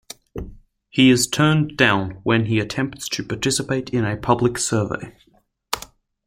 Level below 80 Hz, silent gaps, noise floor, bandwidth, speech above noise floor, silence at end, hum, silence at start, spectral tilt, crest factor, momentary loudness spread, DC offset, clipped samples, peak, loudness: -46 dBFS; none; -43 dBFS; 16.5 kHz; 24 dB; 0.4 s; none; 0.35 s; -4.5 dB/octave; 22 dB; 17 LU; under 0.1%; under 0.1%; 0 dBFS; -20 LUFS